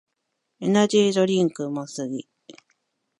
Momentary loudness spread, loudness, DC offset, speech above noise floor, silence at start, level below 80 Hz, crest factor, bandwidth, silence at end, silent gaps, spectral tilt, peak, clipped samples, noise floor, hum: 12 LU; -22 LUFS; under 0.1%; 56 dB; 0.6 s; -72 dBFS; 18 dB; 11.5 kHz; 0.65 s; none; -5.5 dB/octave; -6 dBFS; under 0.1%; -78 dBFS; none